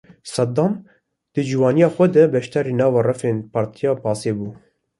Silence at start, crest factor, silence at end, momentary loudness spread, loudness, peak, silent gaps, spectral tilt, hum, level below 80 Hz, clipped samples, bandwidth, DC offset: 0.25 s; 18 dB; 0.45 s; 13 LU; -19 LUFS; -2 dBFS; none; -7 dB/octave; none; -58 dBFS; under 0.1%; 11.5 kHz; under 0.1%